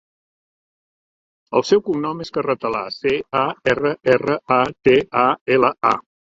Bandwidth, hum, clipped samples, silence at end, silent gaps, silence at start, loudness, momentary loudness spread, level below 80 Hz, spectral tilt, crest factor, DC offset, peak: 7.6 kHz; none; under 0.1%; 0.4 s; 5.41-5.46 s; 1.5 s; -19 LUFS; 7 LU; -56 dBFS; -5.5 dB/octave; 18 dB; under 0.1%; -2 dBFS